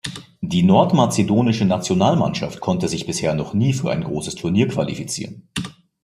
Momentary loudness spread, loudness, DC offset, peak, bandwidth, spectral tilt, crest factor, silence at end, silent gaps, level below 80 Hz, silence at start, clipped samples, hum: 14 LU; -20 LUFS; under 0.1%; -2 dBFS; 14.5 kHz; -6 dB/octave; 18 dB; 0.35 s; none; -52 dBFS; 0.05 s; under 0.1%; none